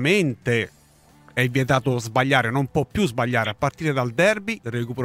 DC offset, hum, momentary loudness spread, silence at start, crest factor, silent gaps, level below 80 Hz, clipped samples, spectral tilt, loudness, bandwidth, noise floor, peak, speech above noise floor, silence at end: under 0.1%; none; 8 LU; 0 s; 20 dB; none; -50 dBFS; under 0.1%; -5.5 dB/octave; -22 LUFS; 16 kHz; -53 dBFS; -2 dBFS; 32 dB; 0 s